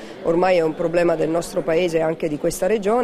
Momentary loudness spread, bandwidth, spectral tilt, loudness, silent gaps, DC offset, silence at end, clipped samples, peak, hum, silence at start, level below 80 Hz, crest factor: 5 LU; 15.5 kHz; -5.5 dB/octave; -20 LUFS; none; under 0.1%; 0 s; under 0.1%; -6 dBFS; none; 0 s; -46 dBFS; 14 dB